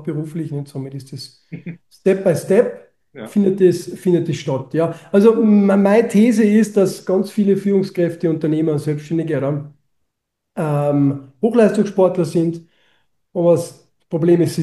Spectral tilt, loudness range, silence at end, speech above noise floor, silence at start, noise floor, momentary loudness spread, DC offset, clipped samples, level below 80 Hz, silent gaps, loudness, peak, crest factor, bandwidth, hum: -7.5 dB/octave; 6 LU; 0 s; 61 dB; 0 s; -77 dBFS; 17 LU; under 0.1%; under 0.1%; -64 dBFS; none; -17 LUFS; -2 dBFS; 16 dB; 12.5 kHz; none